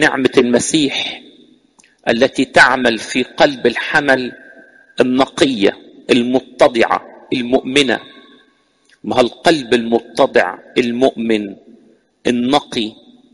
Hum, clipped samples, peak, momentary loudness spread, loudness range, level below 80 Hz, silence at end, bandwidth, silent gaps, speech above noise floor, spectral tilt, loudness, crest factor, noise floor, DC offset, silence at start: none; under 0.1%; 0 dBFS; 10 LU; 3 LU; -50 dBFS; 0.4 s; 11.5 kHz; none; 41 dB; -3.5 dB/octave; -15 LUFS; 16 dB; -56 dBFS; under 0.1%; 0 s